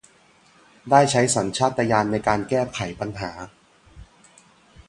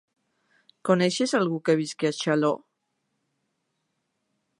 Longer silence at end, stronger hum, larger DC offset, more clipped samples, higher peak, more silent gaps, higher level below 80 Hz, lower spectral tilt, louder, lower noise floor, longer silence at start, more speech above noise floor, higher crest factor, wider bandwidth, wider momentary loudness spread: second, 0.85 s vs 2.05 s; neither; neither; neither; first, -2 dBFS vs -6 dBFS; neither; first, -52 dBFS vs -78 dBFS; about the same, -4.5 dB/octave vs -5 dB/octave; first, -21 LUFS vs -25 LUFS; second, -56 dBFS vs -77 dBFS; about the same, 0.85 s vs 0.85 s; second, 35 dB vs 54 dB; about the same, 22 dB vs 22 dB; about the same, 11.5 kHz vs 11.5 kHz; first, 15 LU vs 5 LU